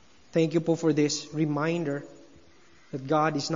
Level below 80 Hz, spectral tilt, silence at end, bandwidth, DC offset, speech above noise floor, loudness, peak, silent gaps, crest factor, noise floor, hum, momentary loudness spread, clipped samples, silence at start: -70 dBFS; -5.5 dB/octave; 0 s; 7.6 kHz; 0.2%; 32 dB; -27 LUFS; -12 dBFS; none; 16 dB; -58 dBFS; none; 10 LU; under 0.1%; 0.35 s